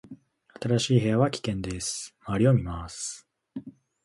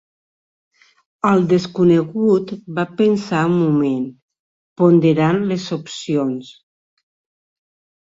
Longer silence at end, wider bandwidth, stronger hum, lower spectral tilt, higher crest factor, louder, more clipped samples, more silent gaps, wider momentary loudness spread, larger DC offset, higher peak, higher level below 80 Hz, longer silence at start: second, 0.35 s vs 1.6 s; first, 11.5 kHz vs 7.8 kHz; neither; second, -5.5 dB/octave vs -7.5 dB/octave; about the same, 20 dB vs 16 dB; second, -27 LUFS vs -17 LUFS; neither; second, none vs 4.22-4.28 s, 4.39-4.76 s; first, 19 LU vs 11 LU; neither; second, -8 dBFS vs -2 dBFS; first, -48 dBFS vs -60 dBFS; second, 0.05 s vs 1.25 s